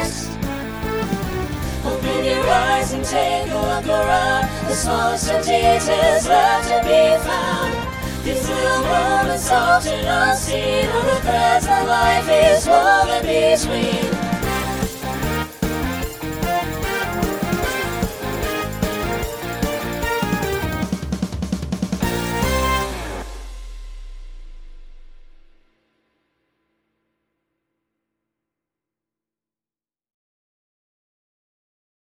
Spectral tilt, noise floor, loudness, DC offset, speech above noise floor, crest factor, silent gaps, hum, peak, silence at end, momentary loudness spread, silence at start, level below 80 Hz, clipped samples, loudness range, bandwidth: -4 dB/octave; under -90 dBFS; -19 LUFS; under 0.1%; over 73 dB; 18 dB; none; none; -2 dBFS; 6.8 s; 11 LU; 0 s; -34 dBFS; under 0.1%; 8 LU; over 20 kHz